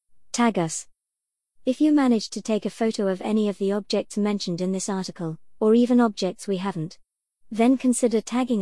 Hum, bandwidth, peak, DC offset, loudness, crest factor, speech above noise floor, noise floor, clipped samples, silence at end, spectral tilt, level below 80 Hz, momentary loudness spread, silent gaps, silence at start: none; 12 kHz; -8 dBFS; 0.3%; -24 LUFS; 14 dB; 63 dB; -85 dBFS; under 0.1%; 0 s; -5 dB/octave; -66 dBFS; 12 LU; none; 0.35 s